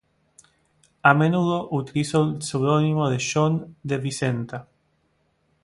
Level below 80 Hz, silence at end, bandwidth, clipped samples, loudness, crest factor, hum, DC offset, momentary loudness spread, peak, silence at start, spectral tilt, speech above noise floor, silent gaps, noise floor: -60 dBFS; 1 s; 11.5 kHz; under 0.1%; -22 LUFS; 24 dB; none; under 0.1%; 10 LU; 0 dBFS; 1.05 s; -6 dB/octave; 46 dB; none; -68 dBFS